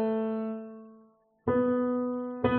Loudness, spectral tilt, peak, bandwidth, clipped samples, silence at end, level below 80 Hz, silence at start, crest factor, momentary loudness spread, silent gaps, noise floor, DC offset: -30 LUFS; -6.5 dB/octave; -12 dBFS; 4.3 kHz; under 0.1%; 0 s; -58 dBFS; 0 s; 18 dB; 15 LU; none; -61 dBFS; under 0.1%